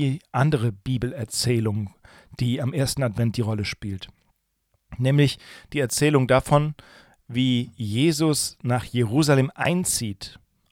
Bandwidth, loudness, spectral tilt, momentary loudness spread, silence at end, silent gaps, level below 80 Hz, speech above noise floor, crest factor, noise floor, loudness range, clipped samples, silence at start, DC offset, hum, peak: 17 kHz; -23 LUFS; -5.5 dB/octave; 13 LU; 0.35 s; none; -50 dBFS; 48 dB; 20 dB; -71 dBFS; 4 LU; under 0.1%; 0 s; under 0.1%; none; -4 dBFS